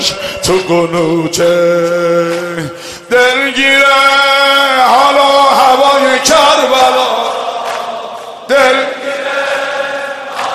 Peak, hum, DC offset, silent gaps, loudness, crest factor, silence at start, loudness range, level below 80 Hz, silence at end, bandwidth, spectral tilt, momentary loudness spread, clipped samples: 0 dBFS; none; under 0.1%; none; -9 LUFS; 10 dB; 0 s; 6 LU; -46 dBFS; 0 s; 14.5 kHz; -2.5 dB/octave; 12 LU; 0.3%